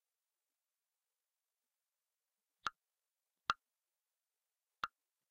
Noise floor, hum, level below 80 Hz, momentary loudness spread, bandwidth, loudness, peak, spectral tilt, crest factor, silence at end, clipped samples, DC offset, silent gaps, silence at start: under -90 dBFS; none; -82 dBFS; 6 LU; 4 kHz; -45 LUFS; -16 dBFS; 1.5 dB/octave; 36 dB; 0.45 s; under 0.1%; under 0.1%; none; 2.65 s